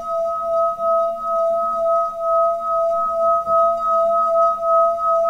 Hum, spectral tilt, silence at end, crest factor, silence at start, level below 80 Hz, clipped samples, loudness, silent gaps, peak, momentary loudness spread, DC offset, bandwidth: none; -5.5 dB/octave; 0 s; 10 dB; 0 s; -54 dBFS; under 0.1%; -18 LUFS; none; -8 dBFS; 4 LU; 0.3%; 7.6 kHz